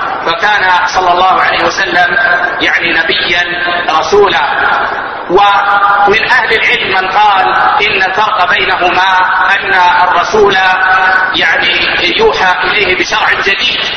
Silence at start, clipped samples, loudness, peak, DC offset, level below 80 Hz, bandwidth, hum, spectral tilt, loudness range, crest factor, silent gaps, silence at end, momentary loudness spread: 0 s; 0.3%; -8 LUFS; 0 dBFS; under 0.1%; -38 dBFS; 11 kHz; none; -2.5 dB/octave; 1 LU; 8 dB; none; 0 s; 3 LU